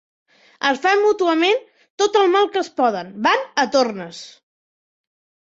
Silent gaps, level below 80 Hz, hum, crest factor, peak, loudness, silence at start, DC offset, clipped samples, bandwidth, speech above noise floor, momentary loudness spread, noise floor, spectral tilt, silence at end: 1.90-1.98 s; -68 dBFS; none; 16 dB; -4 dBFS; -18 LUFS; 0.6 s; under 0.1%; under 0.1%; 7.8 kHz; over 72 dB; 7 LU; under -90 dBFS; -3 dB/octave; 1.1 s